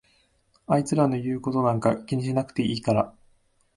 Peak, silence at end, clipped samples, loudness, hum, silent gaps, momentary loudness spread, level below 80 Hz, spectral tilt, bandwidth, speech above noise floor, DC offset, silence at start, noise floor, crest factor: -6 dBFS; 0.65 s; under 0.1%; -25 LUFS; none; none; 5 LU; -58 dBFS; -7 dB/octave; 11.5 kHz; 41 dB; under 0.1%; 0.7 s; -65 dBFS; 20 dB